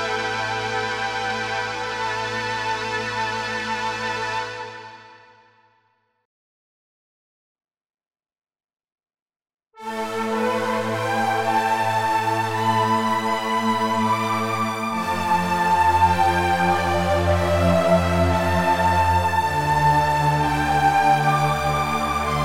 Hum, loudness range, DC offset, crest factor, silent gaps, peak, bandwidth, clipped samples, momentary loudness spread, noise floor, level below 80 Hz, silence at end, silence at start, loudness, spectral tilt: none; 11 LU; under 0.1%; 16 dB; 6.25-7.55 s, 9.22-9.26 s, 9.36-9.40 s; -6 dBFS; 17 kHz; under 0.1%; 7 LU; -66 dBFS; -42 dBFS; 0 s; 0 s; -21 LUFS; -5 dB/octave